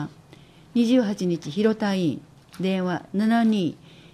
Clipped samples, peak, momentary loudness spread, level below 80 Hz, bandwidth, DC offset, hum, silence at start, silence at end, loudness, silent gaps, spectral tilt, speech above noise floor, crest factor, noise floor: under 0.1%; -8 dBFS; 9 LU; -64 dBFS; 13 kHz; under 0.1%; none; 0 s; 0.4 s; -24 LUFS; none; -6.5 dB/octave; 27 dB; 16 dB; -50 dBFS